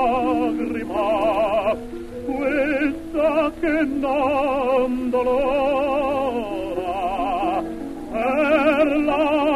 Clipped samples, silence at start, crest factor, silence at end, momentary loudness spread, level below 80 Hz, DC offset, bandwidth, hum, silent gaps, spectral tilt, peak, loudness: under 0.1%; 0 s; 14 dB; 0 s; 8 LU; -42 dBFS; under 0.1%; 13 kHz; none; none; -6 dB/octave; -6 dBFS; -21 LUFS